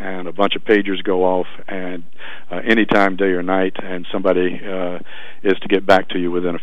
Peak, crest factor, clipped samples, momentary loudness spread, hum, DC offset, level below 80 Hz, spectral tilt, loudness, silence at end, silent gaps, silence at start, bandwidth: 0 dBFS; 18 dB; under 0.1%; 15 LU; none; 8%; -62 dBFS; -6.5 dB/octave; -18 LUFS; 0 s; none; 0 s; 11 kHz